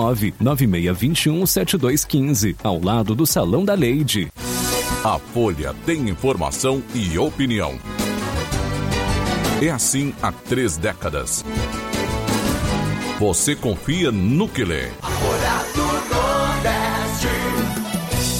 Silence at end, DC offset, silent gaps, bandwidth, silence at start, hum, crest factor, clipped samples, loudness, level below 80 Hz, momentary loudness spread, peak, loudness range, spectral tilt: 0 s; under 0.1%; none; 17 kHz; 0 s; none; 14 dB; under 0.1%; -20 LUFS; -34 dBFS; 6 LU; -6 dBFS; 3 LU; -4.5 dB/octave